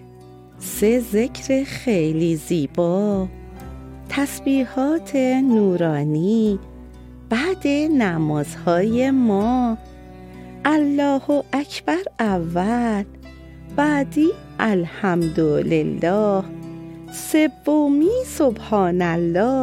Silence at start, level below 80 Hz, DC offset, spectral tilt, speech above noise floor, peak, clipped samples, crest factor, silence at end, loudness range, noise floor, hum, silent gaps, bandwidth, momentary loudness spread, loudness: 0 s; -44 dBFS; under 0.1%; -6.5 dB/octave; 24 dB; -4 dBFS; under 0.1%; 16 dB; 0 s; 2 LU; -43 dBFS; none; none; 16.5 kHz; 13 LU; -20 LUFS